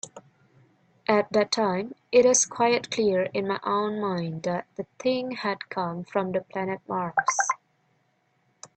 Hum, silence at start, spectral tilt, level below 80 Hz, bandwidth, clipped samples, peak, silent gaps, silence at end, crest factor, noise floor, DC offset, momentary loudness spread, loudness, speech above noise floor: none; 0.05 s; -3.5 dB/octave; -68 dBFS; 9 kHz; under 0.1%; -6 dBFS; none; 0.1 s; 20 dB; -69 dBFS; under 0.1%; 11 LU; -26 LUFS; 44 dB